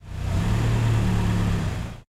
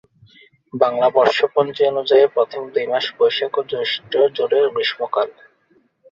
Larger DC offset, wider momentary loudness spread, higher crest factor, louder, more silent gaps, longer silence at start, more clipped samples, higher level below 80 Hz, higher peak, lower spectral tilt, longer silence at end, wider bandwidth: neither; about the same, 7 LU vs 7 LU; second, 12 dB vs 18 dB; second, -24 LUFS vs -18 LUFS; neither; second, 0.05 s vs 0.75 s; neither; first, -30 dBFS vs -66 dBFS; second, -10 dBFS vs -2 dBFS; first, -6.5 dB/octave vs -4.5 dB/octave; second, 0.15 s vs 0.8 s; first, 13.5 kHz vs 7.4 kHz